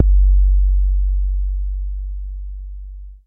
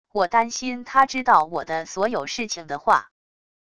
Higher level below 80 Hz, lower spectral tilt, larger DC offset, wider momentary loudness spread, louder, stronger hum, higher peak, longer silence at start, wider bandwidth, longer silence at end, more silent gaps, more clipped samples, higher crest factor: first, -16 dBFS vs -60 dBFS; first, -12.5 dB/octave vs -2.5 dB/octave; second, under 0.1% vs 0.4%; first, 19 LU vs 10 LU; about the same, -20 LUFS vs -22 LUFS; neither; about the same, -2 dBFS vs -2 dBFS; second, 0 s vs 0.15 s; second, 0.2 kHz vs 11 kHz; second, 0.1 s vs 0.75 s; neither; neither; about the same, 16 dB vs 20 dB